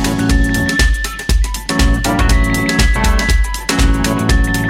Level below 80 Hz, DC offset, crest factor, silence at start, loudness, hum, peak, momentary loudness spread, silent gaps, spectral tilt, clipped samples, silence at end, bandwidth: -14 dBFS; under 0.1%; 12 dB; 0 s; -14 LUFS; none; 0 dBFS; 4 LU; none; -4.5 dB/octave; under 0.1%; 0 s; 16.5 kHz